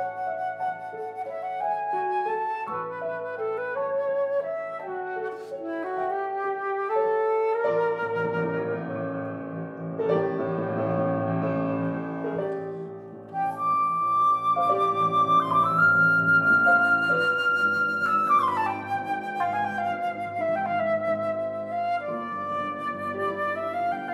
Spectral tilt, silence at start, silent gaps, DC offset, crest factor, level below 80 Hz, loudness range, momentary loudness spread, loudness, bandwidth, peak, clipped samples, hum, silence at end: -7 dB/octave; 0 s; none; under 0.1%; 16 dB; -76 dBFS; 9 LU; 13 LU; -25 LUFS; 13 kHz; -10 dBFS; under 0.1%; none; 0 s